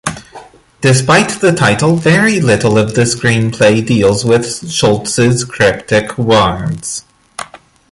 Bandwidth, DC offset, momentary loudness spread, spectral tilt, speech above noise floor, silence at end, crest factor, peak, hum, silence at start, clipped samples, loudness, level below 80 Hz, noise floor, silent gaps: 11.5 kHz; under 0.1%; 13 LU; -5 dB/octave; 26 dB; 0.45 s; 12 dB; 0 dBFS; none; 0.05 s; under 0.1%; -11 LUFS; -40 dBFS; -36 dBFS; none